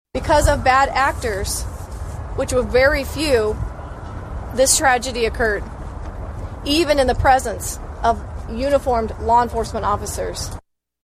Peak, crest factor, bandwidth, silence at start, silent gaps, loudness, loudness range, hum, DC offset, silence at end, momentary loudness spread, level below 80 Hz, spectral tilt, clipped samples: -2 dBFS; 16 dB; 15 kHz; 0.15 s; none; -19 LUFS; 3 LU; none; under 0.1%; 0.5 s; 16 LU; -30 dBFS; -3.5 dB/octave; under 0.1%